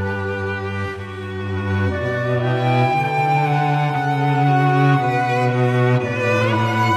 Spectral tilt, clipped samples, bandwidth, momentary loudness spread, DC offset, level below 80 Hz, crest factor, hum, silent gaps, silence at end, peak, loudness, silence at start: -7.5 dB/octave; under 0.1%; 12 kHz; 9 LU; under 0.1%; -52 dBFS; 14 dB; none; none; 0 s; -4 dBFS; -19 LUFS; 0 s